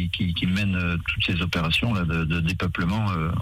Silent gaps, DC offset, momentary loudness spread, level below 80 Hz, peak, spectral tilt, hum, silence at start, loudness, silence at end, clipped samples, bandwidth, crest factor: none; under 0.1%; 3 LU; -38 dBFS; -10 dBFS; -6 dB/octave; none; 0 s; -24 LUFS; 0 s; under 0.1%; 15.5 kHz; 12 dB